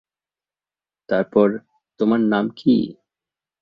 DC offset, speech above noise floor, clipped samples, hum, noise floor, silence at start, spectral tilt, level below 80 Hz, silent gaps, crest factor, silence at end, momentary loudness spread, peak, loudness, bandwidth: under 0.1%; over 72 dB; under 0.1%; none; under -90 dBFS; 1.1 s; -9 dB/octave; -62 dBFS; none; 18 dB; 0.7 s; 7 LU; -4 dBFS; -20 LUFS; 5.4 kHz